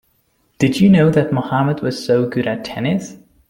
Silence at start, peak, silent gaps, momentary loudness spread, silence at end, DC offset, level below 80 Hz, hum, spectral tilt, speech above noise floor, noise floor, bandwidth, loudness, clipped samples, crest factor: 0.6 s; -2 dBFS; none; 10 LU; 0.35 s; under 0.1%; -50 dBFS; none; -7 dB/octave; 46 dB; -62 dBFS; 15.5 kHz; -16 LUFS; under 0.1%; 14 dB